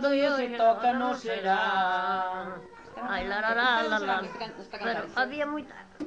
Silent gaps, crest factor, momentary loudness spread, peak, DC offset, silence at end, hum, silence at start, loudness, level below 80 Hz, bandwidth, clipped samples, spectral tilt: none; 16 dB; 14 LU; -12 dBFS; under 0.1%; 0 s; none; 0 s; -28 LUFS; -60 dBFS; 8.8 kHz; under 0.1%; -4.5 dB/octave